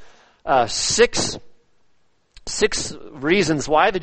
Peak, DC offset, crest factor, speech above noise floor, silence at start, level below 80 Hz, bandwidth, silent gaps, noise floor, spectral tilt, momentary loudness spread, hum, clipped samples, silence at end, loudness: -2 dBFS; under 0.1%; 20 dB; 45 dB; 0 s; -44 dBFS; 8.8 kHz; none; -65 dBFS; -3 dB/octave; 15 LU; none; under 0.1%; 0 s; -20 LUFS